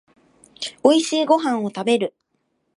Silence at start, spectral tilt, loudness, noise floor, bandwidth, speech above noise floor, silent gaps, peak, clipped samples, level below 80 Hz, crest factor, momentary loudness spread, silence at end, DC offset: 0.6 s; -4 dB/octave; -19 LUFS; -71 dBFS; 11.5 kHz; 52 dB; none; -2 dBFS; under 0.1%; -72 dBFS; 20 dB; 13 LU; 0.65 s; under 0.1%